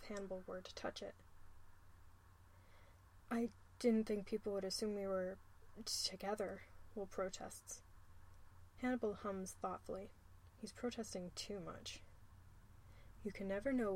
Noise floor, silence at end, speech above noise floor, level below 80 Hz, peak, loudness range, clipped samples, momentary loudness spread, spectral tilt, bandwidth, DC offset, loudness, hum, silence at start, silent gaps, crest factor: -65 dBFS; 0 s; 21 dB; -66 dBFS; -26 dBFS; 8 LU; under 0.1%; 25 LU; -4 dB/octave; 16.5 kHz; under 0.1%; -45 LUFS; none; 0 s; none; 20 dB